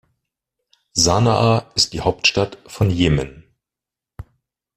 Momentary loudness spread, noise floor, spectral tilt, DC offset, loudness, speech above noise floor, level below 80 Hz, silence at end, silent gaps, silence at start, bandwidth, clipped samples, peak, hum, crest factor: 8 LU; -87 dBFS; -4 dB/octave; under 0.1%; -18 LUFS; 70 dB; -40 dBFS; 0.55 s; none; 0.95 s; 14.5 kHz; under 0.1%; -2 dBFS; none; 18 dB